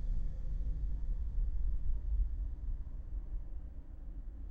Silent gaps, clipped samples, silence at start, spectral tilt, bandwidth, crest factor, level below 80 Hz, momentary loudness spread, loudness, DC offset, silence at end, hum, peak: none; under 0.1%; 0 s; -9.5 dB/octave; 1.9 kHz; 12 dB; -36 dBFS; 11 LU; -43 LUFS; under 0.1%; 0 s; none; -22 dBFS